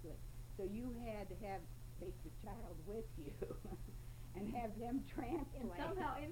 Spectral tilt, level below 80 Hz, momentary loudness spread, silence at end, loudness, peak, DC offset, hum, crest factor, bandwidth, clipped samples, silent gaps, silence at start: -7 dB/octave; -54 dBFS; 10 LU; 0 s; -48 LUFS; -30 dBFS; under 0.1%; none; 16 dB; 16.5 kHz; under 0.1%; none; 0 s